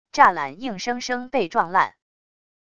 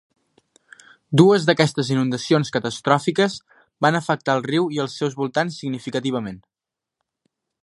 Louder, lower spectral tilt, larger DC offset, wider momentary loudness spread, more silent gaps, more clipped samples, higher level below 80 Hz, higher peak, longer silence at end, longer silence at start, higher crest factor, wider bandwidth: about the same, -22 LUFS vs -20 LUFS; second, -3.5 dB/octave vs -5.5 dB/octave; first, 0.5% vs under 0.1%; about the same, 11 LU vs 10 LU; neither; neither; about the same, -60 dBFS vs -64 dBFS; about the same, -2 dBFS vs 0 dBFS; second, 0.8 s vs 1.25 s; second, 0.15 s vs 1.1 s; about the same, 22 dB vs 20 dB; second, 9.6 kHz vs 11.5 kHz